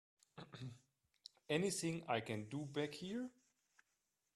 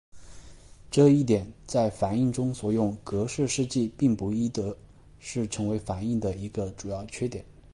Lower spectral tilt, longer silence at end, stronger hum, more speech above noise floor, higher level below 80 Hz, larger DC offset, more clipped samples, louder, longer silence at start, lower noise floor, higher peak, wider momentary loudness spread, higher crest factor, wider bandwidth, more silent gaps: second, -4.5 dB/octave vs -6.5 dB/octave; first, 1.05 s vs 0.2 s; neither; first, 45 dB vs 22 dB; second, -80 dBFS vs -50 dBFS; neither; neither; second, -44 LUFS vs -27 LUFS; first, 0.35 s vs 0.15 s; first, -87 dBFS vs -48 dBFS; second, -22 dBFS vs -8 dBFS; first, 21 LU vs 12 LU; first, 24 dB vs 18 dB; first, 13.5 kHz vs 11.5 kHz; neither